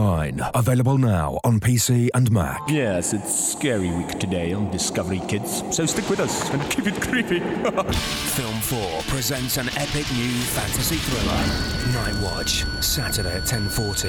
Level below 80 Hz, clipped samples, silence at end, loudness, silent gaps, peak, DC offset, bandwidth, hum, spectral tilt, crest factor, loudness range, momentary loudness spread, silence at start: -36 dBFS; under 0.1%; 0 s; -22 LUFS; none; -8 dBFS; under 0.1%; 19 kHz; none; -4 dB/octave; 14 dB; 3 LU; 5 LU; 0 s